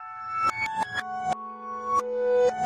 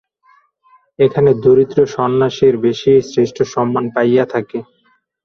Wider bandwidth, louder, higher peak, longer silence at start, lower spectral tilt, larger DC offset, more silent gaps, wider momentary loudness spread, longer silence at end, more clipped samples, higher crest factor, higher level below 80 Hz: first, 11.5 kHz vs 6.8 kHz; second, -28 LUFS vs -14 LUFS; second, -14 dBFS vs 0 dBFS; second, 0 s vs 1 s; second, -3.5 dB/octave vs -7 dB/octave; neither; neither; first, 10 LU vs 7 LU; second, 0 s vs 0.65 s; neither; about the same, 14 dB vs 14 dB; second, -66 dBFS vs -52 dBFS